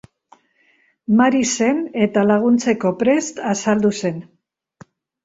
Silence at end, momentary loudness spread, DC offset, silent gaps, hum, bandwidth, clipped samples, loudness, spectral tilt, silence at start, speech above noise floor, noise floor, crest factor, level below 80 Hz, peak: 1 s; 9 LU; under 0.1%; none; none; 8 kHz; under 0.1%; -18 LUFS; -5 dB/octave; 1.1 s; 43 dB; -59 dBFS; 18 dB; -60 dBFS; -2 dBFS